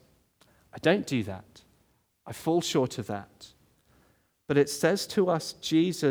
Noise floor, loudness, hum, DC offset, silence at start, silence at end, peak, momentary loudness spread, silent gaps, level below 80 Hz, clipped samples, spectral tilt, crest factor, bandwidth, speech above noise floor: -69 dBFS; -28 LUFS; none; under 0.1%; 0.75 s; 0 s; -10 dBFS; 14 LU; none; -68 dBFS; under 0.1%; -5 dB/octave; 20 dB; over 20 kHz; 42 dB